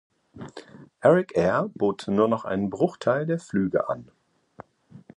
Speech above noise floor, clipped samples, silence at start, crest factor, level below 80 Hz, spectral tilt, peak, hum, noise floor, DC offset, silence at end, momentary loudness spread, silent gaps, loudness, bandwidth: 27 dB; under 0.1%; 0.35 s; 20 dB; -58 dBFS; -7.5 dB/octave; -6 dBFS; none; -50 dBFS; under 0.1%; 0.2 s; 21 LU; none; -24 LUFS; 11 kHz